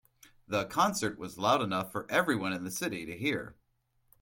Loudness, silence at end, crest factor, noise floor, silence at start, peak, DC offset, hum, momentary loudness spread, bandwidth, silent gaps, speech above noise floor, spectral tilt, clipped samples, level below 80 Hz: -31 LUFS; 0.7 s; 20 dB; -74 dBFS; 0.5 s; -12 dBFS; under 0.1%; none; 7 LU; 17 kHz; none; 42 dB; -4 dB/octave; under 0.1%; -66 dBFS